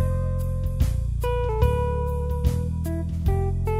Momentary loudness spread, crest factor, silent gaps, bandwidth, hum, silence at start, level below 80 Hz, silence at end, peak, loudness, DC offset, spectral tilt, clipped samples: 5 LU; 16 dB; none; 16 kHz; none; 0 s; -26 dBFS; 0 s; -6 dBFS; -25 LUFS; under 0.1%; -8 dB/octave; under 0.1%